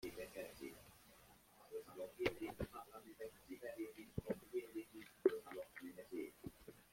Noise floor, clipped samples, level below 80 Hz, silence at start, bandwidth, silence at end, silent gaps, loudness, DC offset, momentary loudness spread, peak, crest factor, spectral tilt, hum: -67 dBFS; under 0.1%; -70 dBFS; 0 s; 16.5 kHz; 0.05 s; none; -49 LUFS; under 0.1%; 21 LU; -20 dBFS; 28 dB; -5.5 dB/octave; none